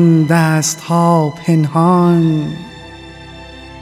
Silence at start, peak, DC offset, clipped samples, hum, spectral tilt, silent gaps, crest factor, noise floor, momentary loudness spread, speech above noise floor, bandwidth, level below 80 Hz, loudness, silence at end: 0 s; 0 dBFS; under 0.1%; under 0.1%; none; -6 dB/octave; none; 14 dB; -33 dBFS; 22 LU; 21 dB; 14.5 kHz; -46 dBFS; -13 LUFS; 0 s